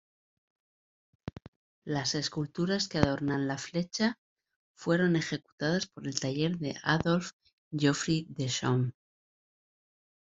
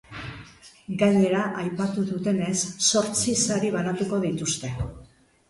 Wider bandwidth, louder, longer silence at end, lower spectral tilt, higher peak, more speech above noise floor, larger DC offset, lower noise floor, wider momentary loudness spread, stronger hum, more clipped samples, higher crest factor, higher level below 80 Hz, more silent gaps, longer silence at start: second, 8 kHz vs 11.5 kHz; second, -31 LUFS vs -24 LUFS; first, 1.45 s vs 0.45 s; about the same, -5 dB/octave vs -4 dB/octave; first, -4 dBFS vs -8 dBFS; first, over 60 dB vs 23 dB; neither; first, under -90 dBFS vs -48 dBFS; second, 12 LU vs 15 LU; neither; neither; first, 28 dB vs 18 dB; second, -62 dBFS vs -50 dBFS; first, 1.48-1.82 s, 4.18-4.36 s, 4.56-4.75 s, 5.52-5.58 s, 7.33-7.40 s, 7.53-7.71 s vs none; first, 1.25 s vs 0.1 s